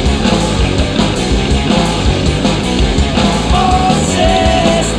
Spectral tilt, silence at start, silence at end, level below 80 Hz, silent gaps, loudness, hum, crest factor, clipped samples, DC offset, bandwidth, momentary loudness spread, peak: -5 dB/octave; 0 s; 0 s; -18 dBFS; none; -12 LUFS; none; 12 dB; under 0.1%; under 0.1%; 10.5 kHz; 3 LU; 0 dBFS